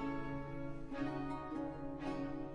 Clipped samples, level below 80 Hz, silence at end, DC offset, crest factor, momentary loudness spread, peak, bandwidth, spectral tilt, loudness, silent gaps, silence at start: under 0.1%; -54 dBFS; 0 s; under 0.1%; 14 dB; 4 LU; -28 dBFS; 10.5 kHz; -8 dB/octave; -44 LUFS; none; 0 s